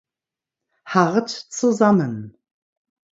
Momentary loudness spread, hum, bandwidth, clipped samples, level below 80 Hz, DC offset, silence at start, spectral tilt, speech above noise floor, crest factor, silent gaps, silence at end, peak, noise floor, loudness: 12 LU; none; 7.8 kHz; under 0.1%; -66 dBFS; under 0.1%; 0.85 s; -5.5 dB/octave; 70 dB; 22 dB; none; 0.85 s; 0 dBFS; -89 dBFS; -19 LUFS